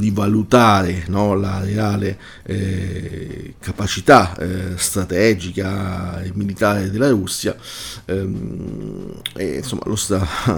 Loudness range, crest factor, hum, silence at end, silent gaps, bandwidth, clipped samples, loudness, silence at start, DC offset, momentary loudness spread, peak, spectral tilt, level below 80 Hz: 5 LU; 18 dB; none; 0 s; none; 19 kHz; under 0.1%; -19 LUFS; 0 s; under 0.1%; 17 LU; 0 dBFS; -5 dB/octave; -40 dBFS